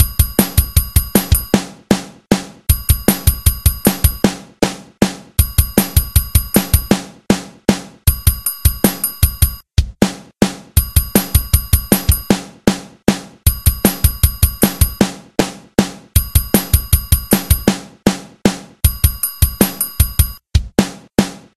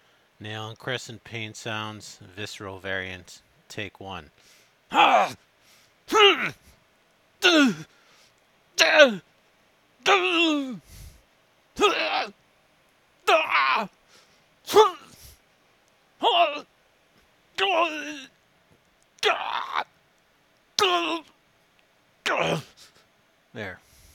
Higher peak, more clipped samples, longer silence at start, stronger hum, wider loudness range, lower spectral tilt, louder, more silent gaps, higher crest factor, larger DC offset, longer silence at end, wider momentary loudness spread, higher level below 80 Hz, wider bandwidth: about the same, 0 dBFS vs 0 dBFS; first, 0.2% vs under 0.1%; second, 0 s vs 0.4 s; neither; second, 1 LU vs 11 LU; first, -4.5 dB/octave vs -3 dB/octave; first, -16 LUFS vs -23 LUFS; neither; second, 16 dB vs 26 dB; neither; second, 0.2 s vs 0.4 s; second, 4 LU vs 21 LU; first, -20 dBFS vs -64 dBFS; second, 16 kHz vs 18 kHz